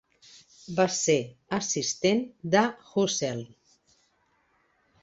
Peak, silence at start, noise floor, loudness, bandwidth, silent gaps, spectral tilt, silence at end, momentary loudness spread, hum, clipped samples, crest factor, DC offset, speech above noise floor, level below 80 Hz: -8 dBFS; 0.7 s; -69 dBFS; -27 LUFS; 8.2 kHz; none; -3.5 dB/octave; 1.55 s; 9 LU; none; under 0.1%; 22 dB; under 0.1%; 42 dB; -68 dBFS